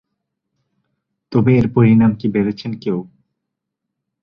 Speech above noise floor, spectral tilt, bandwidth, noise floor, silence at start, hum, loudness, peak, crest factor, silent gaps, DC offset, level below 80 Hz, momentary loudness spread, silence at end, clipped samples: 64 dB; -10 dB/octave; 5.8 kHz; -79 dBFS; 1.3 s; none; -16 LUFS; -2 dBFS; 16 dB; none; under 0.1%; -48 dBFS; 12 LU; 1.2 s; under 0.1%